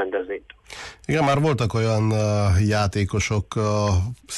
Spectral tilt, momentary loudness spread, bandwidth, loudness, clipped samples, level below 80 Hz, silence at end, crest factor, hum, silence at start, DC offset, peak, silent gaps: -6 dB/octave; 15 LU; 12 kHz; -22 LUFS; under 0.1%; -34 dBFS; 0 s; 12 dB; none; 0 s; under 0.1%; -10 dBFS; none